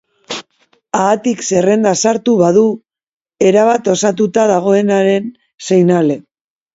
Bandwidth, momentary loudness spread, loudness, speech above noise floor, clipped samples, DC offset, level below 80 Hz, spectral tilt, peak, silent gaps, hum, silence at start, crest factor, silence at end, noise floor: 8 kHz; 15 LU; -13 LUFS; 46 dB; under 0.1%; under 0.1%; -58 dBFS; -5 dB/octave; 0 dBFS; 3.13-3.20 s, 5.54-5.58 s; none; 0.3 s; 14 dB; 0.55 s; -57 dBFS